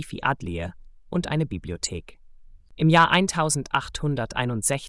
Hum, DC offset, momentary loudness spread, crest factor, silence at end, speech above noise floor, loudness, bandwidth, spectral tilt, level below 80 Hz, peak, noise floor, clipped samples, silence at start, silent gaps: none; under 0.1%; 13 LU; 20 dB; 0 s; 23 dB; -24 LUFS; 12 kHz; -4 dB/octave; -46 dBFS; -6 dBFS; -47 dBFS; under 0.1%; 0 s; none